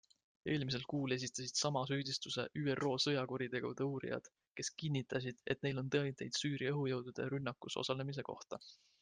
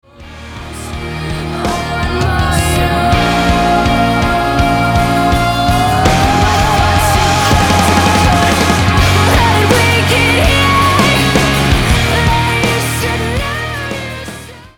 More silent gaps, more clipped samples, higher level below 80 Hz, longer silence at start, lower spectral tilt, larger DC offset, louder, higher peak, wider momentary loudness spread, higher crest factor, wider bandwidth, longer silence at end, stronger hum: first, 4.50-4.55 s vs none; neither; second, -74 dBFS vs -22 dBFS; first, 0.45 s vs 0.2 s; about the same, -4.5 dB/octave vs -4.5 dB/octave; neither; second, -40 LUFS vs -11 LUFS; second, -22 dBFS vs 0 dBFS; about the same, 9 LU vs 11 LU; first, 18 dB vs 12 dB; second, 10 kHz vs 20 kHz; about the same, 0.25 s vs 0.15 s; neither